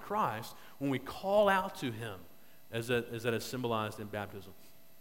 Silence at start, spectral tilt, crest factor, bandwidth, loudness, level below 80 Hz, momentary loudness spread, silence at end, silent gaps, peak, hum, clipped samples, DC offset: 0 s; -5 dB/octave; 22 dB; 16.5 kHz; -35 LUFS; -64 dBFS; 16 LU; 0.1 s; none; -14 dBFS; none; under 0.1%; 0.2%